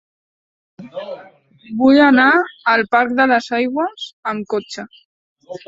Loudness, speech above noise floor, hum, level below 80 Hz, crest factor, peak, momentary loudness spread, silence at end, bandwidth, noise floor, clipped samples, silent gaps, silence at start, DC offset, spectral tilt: -15 LUFS; 28 dB; none; -60 dBFS; 16 dB; 0 dBFS; 22 LU; 0.1 s; 7.8 kHz; -44 dBFS; under 0.1%; 4.13-4.23 s, 5.05-5.36 s; 0.8 s; under 0.1%; -5 dB/octave